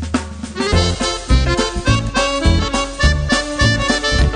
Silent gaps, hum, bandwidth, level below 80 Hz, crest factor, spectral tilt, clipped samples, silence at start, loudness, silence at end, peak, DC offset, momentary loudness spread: none; none; 10 kHz; -20 dBFS; 14 dB; -4.5 dB/octave; under 0.1%; 0 s; -16 LUFS; 0 s; 0 dBFS; under 0.1%; 5 LU